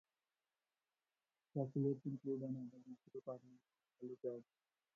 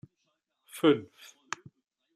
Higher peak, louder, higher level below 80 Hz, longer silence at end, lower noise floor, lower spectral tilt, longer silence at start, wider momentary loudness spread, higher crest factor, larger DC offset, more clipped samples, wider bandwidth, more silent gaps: second, -28 dBFS vs -10 dBFS; second, -47 LUFS vs -28 LUFS; second, -86 dBFS vs -76 dBFS; second, 0.55 s vs 1.1 s; first, under -90 dBFS vs -79 dBFS; first, -13 dB/octave vs -5 dB/octave; first, 1.55 s vs 0.75 s; second, 15 LU vs 22 LU; about the same, 20 dB vs 22 dB; neither; neither; second, 6.6 kHz vs 15 kHz; neither